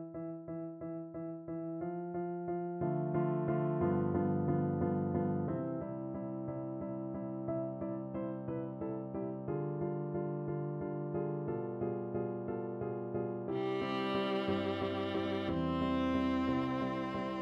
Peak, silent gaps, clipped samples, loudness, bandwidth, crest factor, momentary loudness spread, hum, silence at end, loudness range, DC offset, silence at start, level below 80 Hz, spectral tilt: -22 dBFS; none; under 0.1%; -37 LUFS; 6.4 kHz; 14 dB; 8 LU; none; 0 s; 5 LU; under 0.1%; 0 s; -62 dBFS; -9 dB/octave